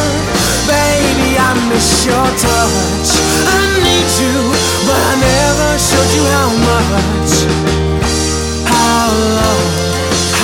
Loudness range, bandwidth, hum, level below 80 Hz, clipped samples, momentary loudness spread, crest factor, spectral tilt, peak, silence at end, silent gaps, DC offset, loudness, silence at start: 1 LU; 17 kHz; none; -24 dBFS; under 0.1%; 3 LU; 12 dB; -3.5 dB/octave; 0 dBFS; 0 s; none; under 0.1%; -11 LUFS; 0 s